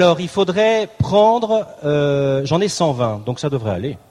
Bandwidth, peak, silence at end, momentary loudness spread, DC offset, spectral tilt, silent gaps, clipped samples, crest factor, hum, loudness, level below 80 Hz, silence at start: 12.5 kHz; -2 dBFS; 0.15 s; 8 LU; under 0.1%; -6 dB/octave; none; under 0.1%; 14 dB; none; -17 LUFS; -46 dBFS; 0 s